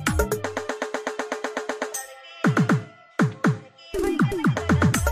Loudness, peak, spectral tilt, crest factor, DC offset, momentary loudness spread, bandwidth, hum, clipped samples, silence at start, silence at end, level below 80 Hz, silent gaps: -25 LUFS; -6 dBFS; -5.5 dB/octave; 18 dB; under 0.1%; 11 LU; 15.5 kHz; none; under 0.1%; 0 s; 0 s; -38 dBFS; none